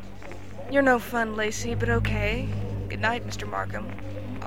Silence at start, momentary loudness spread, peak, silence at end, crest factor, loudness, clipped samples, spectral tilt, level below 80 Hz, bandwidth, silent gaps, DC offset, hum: 0 s; 14 LU; -8 dBFS; 0 s; 20 dB; -27 LUFS; under 0.1%; -5.5 dB/octave; -40 dBFS; 16.5 kHz; none; 1%; none